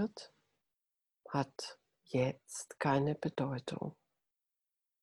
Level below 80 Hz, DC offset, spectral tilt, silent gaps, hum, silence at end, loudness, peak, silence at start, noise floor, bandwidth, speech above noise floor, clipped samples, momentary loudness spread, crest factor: -74 dBFS; under 0.1%; -6 dB/octave; none; none; 1.1 s; -38 LUFS; -18 dBFS; 0 s; -89 dBFS; 12.5 kHz; 52 dB; under 0.1%; 13 LU; 20 dB